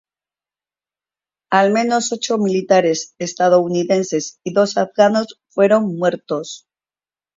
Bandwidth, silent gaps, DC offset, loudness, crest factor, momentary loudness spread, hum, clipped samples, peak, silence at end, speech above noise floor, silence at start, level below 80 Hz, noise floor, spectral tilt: 7.8 kHz; none; under 0.1%; -17 LUFS; 18 dB; 10 LU; none; under 0.1%; 0 dBFS; 0.8 s; over 74 dB; 1.5 s; -68 dBFS; under -90 dBFS; -4.5 dB/octave